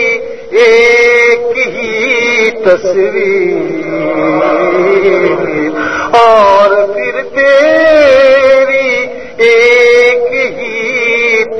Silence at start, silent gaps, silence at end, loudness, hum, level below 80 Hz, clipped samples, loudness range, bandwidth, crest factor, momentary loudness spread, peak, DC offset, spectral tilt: 0 s; none; 0 s; -8 LUFS; none; -44 dBFS; 1%; 4 LU; 9.4 kHz; 8 dB; 9 LU; 0 dBFS; 2%; -4 dB/octave